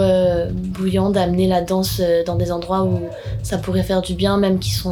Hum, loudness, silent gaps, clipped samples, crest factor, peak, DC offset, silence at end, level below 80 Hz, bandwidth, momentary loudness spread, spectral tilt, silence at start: none; -19 LUFS; none; under 0.1%; 14 dB; -4 dBFS; under 0.1%; 0 s; -34 dBFS; 19 kHz; 7 LU; -6.5 dB/octave; 0 s